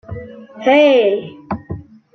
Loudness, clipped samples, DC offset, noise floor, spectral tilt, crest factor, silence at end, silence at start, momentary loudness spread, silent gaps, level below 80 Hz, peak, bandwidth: -13 LUFS; under 0.1%; under 0.1%; -32 dBFS; -6.5 dB/octave; 16 dB; 0.35 s; 0.1 s; 21 LU; none; -48 dBFS; -2 dBFS; 6.4 kHz